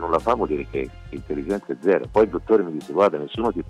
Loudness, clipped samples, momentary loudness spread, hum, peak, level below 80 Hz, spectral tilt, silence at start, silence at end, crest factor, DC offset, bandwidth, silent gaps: -22 LUFS; under 0.1%; 10 LU; none; -6 dBFS; -44 dBFS; -7 dB/octave; 0 s; 0 s; 16 dB; under 0.1%; 11 kHz; none